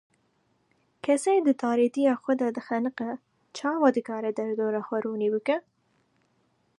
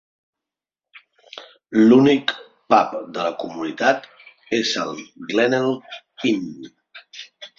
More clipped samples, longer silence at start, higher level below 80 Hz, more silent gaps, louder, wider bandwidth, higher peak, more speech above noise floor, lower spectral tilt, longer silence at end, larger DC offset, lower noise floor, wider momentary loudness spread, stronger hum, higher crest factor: neither; about the same, 1.05 s vs 0.95 s; second, -80 dBFS vs -66 dBFS; neither; second, -27 LUFS vs -20 LUFS; first, 11.5 kHz vs 7.6 kHz; second, -8 dBFS vs -2 dBFS; second, 44 dB vs 69 dB; about the same, -5 dB/octave vs -5 dB/octave; first, 1.2 s vs 0.1 s; neither; second, -70 dBFS vs -88 dBFS; second, 10 LU vs 25 LU; neither; about the same, 20 dB vs 20 dB